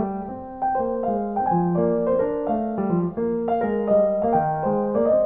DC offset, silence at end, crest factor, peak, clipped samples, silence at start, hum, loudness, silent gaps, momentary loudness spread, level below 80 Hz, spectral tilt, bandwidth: under 0.1%; 0 s; 14 dB; -8 dBFS; under 0.1%; 0 s; none; -23 LUFS; none; 5 LU; -52 dBFS; -13 dB/octave; 3.7 kHz